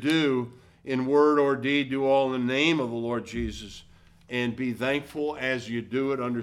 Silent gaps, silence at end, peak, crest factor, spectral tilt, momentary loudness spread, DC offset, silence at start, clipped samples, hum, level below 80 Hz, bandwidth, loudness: none; 0 s; -10 dBFS; 16 dB; -5.5 dB/octave; 11 LU; under 0.1%; 0 s; under 0.1%; none; -52 dBFS; 13 kHz; -26 LUFS